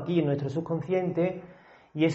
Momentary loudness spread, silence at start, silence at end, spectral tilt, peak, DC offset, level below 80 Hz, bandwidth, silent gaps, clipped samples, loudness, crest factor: 10 LU; 0 s; 0 s; -7 dB/octave; -12 dBFS; under 0.1%; -64 dBFS; 7.8 kHz; none; under 0.1%; -29 LUFS; 16 dB